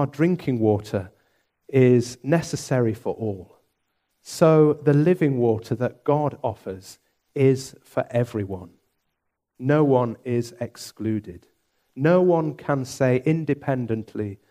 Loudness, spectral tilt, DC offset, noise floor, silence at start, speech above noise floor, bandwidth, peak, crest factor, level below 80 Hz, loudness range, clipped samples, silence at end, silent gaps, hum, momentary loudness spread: -22 LUFS; -7.5 dB/octave; under 0.1%; -78 dBFS; 0 s; 56 dB; 15 kHz; -4 dBFS; 18 dB; -62 dBFS; 5 LU; under 0.1%; 0.15 s; none; none; 15 LU